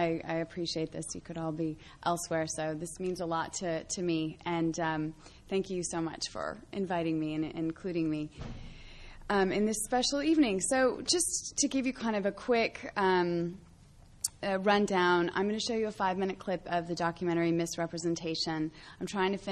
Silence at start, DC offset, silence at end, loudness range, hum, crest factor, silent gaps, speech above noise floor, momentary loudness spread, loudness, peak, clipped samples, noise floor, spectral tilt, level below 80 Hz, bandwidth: 0 s; under 0.1%; 0 s; 6 LU; none; 22 dB; none; 24 dB; 10 LU; -32 LUFS; -10 dBFS; under 0.1%; -56 dBFS; -4 dB/octave; -58 dBFS; 13 kHz